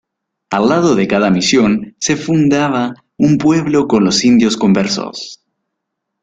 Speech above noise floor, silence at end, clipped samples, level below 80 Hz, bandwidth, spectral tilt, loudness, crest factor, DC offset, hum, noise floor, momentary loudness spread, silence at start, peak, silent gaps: 63 dB; 0.85 s; under 0.1%; -50 dBFS; 9.2 kHz; -5 dB/octave; -13 LUFS; 12 dB; under 0.1%; none; -75 dBFS; 9 LU; 0.5 s; -2 dBFS; none